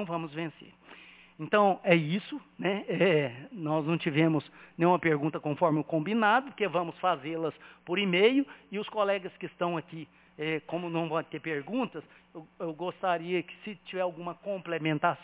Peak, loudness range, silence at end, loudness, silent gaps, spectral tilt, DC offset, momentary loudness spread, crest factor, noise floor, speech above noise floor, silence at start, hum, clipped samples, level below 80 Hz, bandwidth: -8 dBFS; 7 LU; 0 s; -30 LUFS; none; -4.5 dB/octave; under 0.1%; 16 LU; 22 dB; -53 dBFS; 23 dB; 0 s; none; under 0.1%; -76 dBFS; 4 kHz